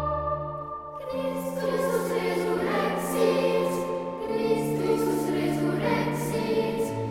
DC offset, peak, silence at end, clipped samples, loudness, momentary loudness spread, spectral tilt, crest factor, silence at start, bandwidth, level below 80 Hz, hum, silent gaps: under 0.1%; -10 dBFS; 0 s; under 0.1%; -27 LUFS; 7 LU; -6 dB/octave; 16 dB; 0 s; 17 kHz; -50 dBFS; none; none